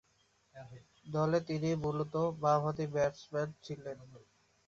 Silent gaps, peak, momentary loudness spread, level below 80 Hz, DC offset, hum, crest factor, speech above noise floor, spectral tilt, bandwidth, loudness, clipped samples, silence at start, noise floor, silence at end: none; -16 dBFS; 22 LU; -66 dBFS; under 0.1%; none; 20 dB; 38 dB; -6.5 dB/octave; 7.4 kHz; -35 LUFS; under 0.1%; 0.55 s; -73 dBFS; 0.5 s